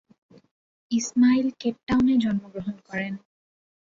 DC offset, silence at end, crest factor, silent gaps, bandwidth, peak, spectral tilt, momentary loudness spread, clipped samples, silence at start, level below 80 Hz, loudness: under 0.1%; 0.7 s; 14 dB; 1.83-1.87 s; 7.6 kHz; -10 dBFS; -5 dB/octave; 14 LU; under 0.1%; 0.9 s; -56 dBFS; -24 LUFS